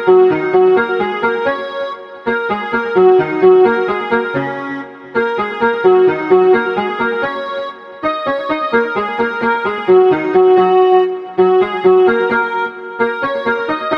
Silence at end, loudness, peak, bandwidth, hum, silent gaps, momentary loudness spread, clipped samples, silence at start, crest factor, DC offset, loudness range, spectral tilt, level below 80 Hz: 0 s; -14 LUFS; 0 dBFS; 5.4 kHz; none; none; 11 LU; under 0.1%; 0 s; 14 dB; under 0.1%; 4 LU; -7.5 dB/octave; -56 dBFS